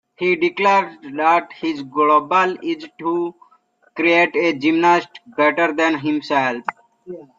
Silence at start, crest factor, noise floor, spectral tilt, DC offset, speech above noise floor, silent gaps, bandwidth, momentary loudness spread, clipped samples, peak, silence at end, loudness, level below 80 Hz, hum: 0.2 s; 16 dB; -57 dBFS; -5 dB/octave; under 0.1%; 39 dB; none; 7.4 kHz; 13 LU; under 0.1%; -2 dBFS; 0.15 s; -18 LUFS; -68 dBFS; none